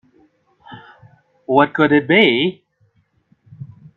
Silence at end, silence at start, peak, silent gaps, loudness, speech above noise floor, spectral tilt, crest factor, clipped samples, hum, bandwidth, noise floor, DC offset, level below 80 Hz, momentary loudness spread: 0.3 s; 0.7 s; 0 dBFS; none; -15 LUFS; 47 dB; -7.5 dB/octave; 20 dB; under 0.1%; none; 4.3 kHz; -61 dBFS; under 0.1%; -62 dBFS; 26 LU